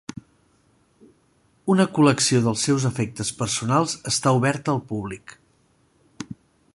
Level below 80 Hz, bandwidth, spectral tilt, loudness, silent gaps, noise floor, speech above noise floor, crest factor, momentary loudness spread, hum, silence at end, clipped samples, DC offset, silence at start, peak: -56 dBFS; 11.5 kHz; -4.5 dB/octave; -22 LUFS; none; -62 dBFS; 41 dB; 22 dB; 21 LU; none; 0.4 s; under 0.1%; under 0.1%; 1.65 s; -2 dBFS